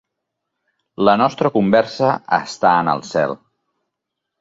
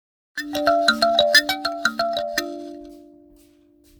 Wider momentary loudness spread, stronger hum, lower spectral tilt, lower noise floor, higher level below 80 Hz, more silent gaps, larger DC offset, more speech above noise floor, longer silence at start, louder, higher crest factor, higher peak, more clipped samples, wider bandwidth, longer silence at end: second, 6 LU vs 20 LU; neither; first, -6 dB/octave vs -1.5 dB/octave; first, -80 dBFS vs -55 dBFS; about the same, -58 dBFS vs -58 dBFS; neither; neither; first, 63 dB vs 36 dB; first, 1 s vs 0.35 s; about the same, -17 LUFS vs -19 LUFS; about the same, 18 dB vs 22 dB; about the same, -2 dBFS vs -2 dBFS; neither; second, 7.8 kHz vs over 20 kHz; about the same, 1.05 s vs 1 s